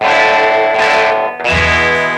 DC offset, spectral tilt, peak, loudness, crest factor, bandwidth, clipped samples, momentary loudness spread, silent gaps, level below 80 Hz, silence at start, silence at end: under 0.1%; -4 dB/octave; 0 dBFS; -10 LUFS; 12 dB; 12 kHz; under 0.1%; 4 LU; none; -32 dBFS; 0 s; 0 s